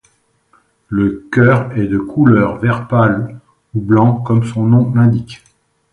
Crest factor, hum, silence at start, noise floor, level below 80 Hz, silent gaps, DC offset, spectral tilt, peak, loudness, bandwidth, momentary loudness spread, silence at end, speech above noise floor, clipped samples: 14 dB; none; 0.9 s; -57 dBFS; -44 dBFS; none; under 0.1%; -9.5 dB/octave; 0 dBFS; -14 LUFS; 8.8 kHz; 10 LU; 0.55 s; 45 dB; under 0.1%